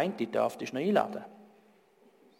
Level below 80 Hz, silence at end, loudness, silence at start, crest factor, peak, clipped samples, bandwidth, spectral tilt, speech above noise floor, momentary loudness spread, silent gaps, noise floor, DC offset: -82 dBFS; 0.95 s; -31 LUFS; 0 s; 20 dB; -12 dBFS; under 0.1%; 16.5 kHz; -6 dB/octave; 32 dB; 14 LU; none; -63 dBFS; under 0.1%